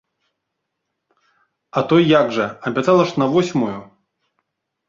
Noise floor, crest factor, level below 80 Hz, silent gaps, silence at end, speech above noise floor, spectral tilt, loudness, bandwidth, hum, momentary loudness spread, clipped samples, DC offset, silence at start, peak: -77 dBFS; 18 dB; -60 dBFS; none; 1.05 s; 61 dB; -6.5 dB/octave; -17 LUFS; 7.6 kHz; none; 11 LU; under 0.1%; under 0.1%; 1.75 s; -2 dBFS